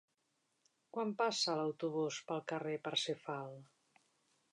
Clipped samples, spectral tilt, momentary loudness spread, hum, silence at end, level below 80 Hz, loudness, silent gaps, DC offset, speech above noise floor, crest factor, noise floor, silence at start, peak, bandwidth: under 0.1%; -3.5 dB/octave; 11 LU; none; 0.9 s; under -90 dBFS; -39 LUFS; none; under 0.1%; 43 dB; 20 dB; -82 dBFS; 0.95 s; -22 dBFS; 11 kHz